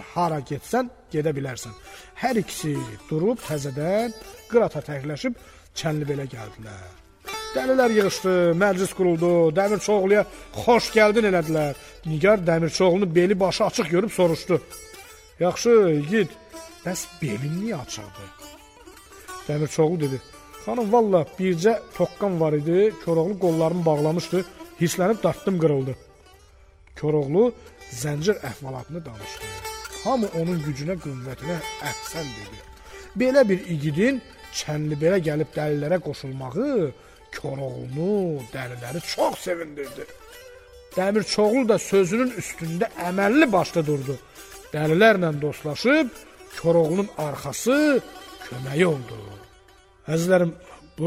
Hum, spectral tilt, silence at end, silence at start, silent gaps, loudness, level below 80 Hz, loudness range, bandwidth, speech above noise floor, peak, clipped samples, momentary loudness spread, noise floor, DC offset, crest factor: none; -5.5 dB/octave; 0 s; 0 s; none; -23 LUFS; -52 dBFS; 8 LU; 16 kHz; 30 dB; -2 dBFS; under 0.1%; 18 LU; -53 dBFS; under 0.1%; 20 dB